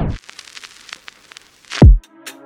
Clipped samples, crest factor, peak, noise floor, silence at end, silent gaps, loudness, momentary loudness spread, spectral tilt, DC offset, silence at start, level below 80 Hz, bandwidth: under 0.1%; 16 dB; 0 dBFS; -44 dBFS; 0.15 s; none; -13 LUFS; 24 LU; -7 dB/octave; under 0.1%; 0 s; -18 dBFS; 10.5 kHz